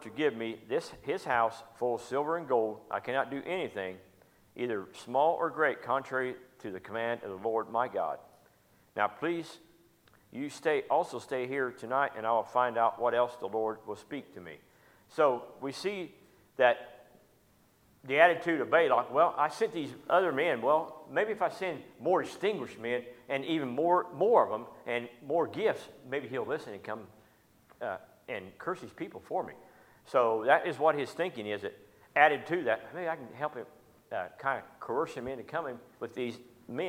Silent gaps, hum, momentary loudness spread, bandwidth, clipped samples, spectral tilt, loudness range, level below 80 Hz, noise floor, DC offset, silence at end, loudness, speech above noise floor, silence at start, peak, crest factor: none; none; 15 LU; 16 kHz; under 0.1%; -5 dB/octave; 7 LU; -76 dBFS; -66 dBFS; under 0.1%; 0 s; -32 LUFS; 34 dB; 0 s; -8 dBFS; 24 dB